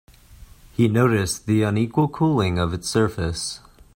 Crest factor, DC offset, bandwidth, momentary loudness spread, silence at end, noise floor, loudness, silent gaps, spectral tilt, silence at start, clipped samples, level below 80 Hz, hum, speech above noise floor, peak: 16 dB; under 0.1%; 16.5 kHz; 10 LU; 0.4 s; -46 dBFS; -21 LUFS; none; -6 dB/octave; 0.3 s; under 0.1%; -46 dBFS; none; 26 dB; -4 dBFS